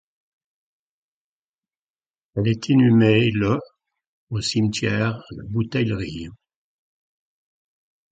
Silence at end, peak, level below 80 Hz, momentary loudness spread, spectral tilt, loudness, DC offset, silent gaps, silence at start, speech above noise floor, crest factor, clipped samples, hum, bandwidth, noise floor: 1.8 s; -4 dBFS; -50 dBFS; 16 LU; -6.5 dB/octave; -21 LUFS; under 0.1%; 4.07-4.27 s; 2.35 s; over 70 dB; 20 dB; under 0.1%; none; 9.2 kHz; under -90 dBFS